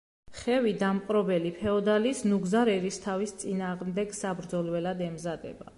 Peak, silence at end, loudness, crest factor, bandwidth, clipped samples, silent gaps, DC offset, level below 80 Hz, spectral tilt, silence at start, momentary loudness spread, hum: -14 dBFS; 0.05 s; -29 LUFS; 14 dB; 11.5 kHz; under 0.1%; none; under 0.1%; -60 dBFS; -5.5 dB/octave; 0.3 s; 9 LU; none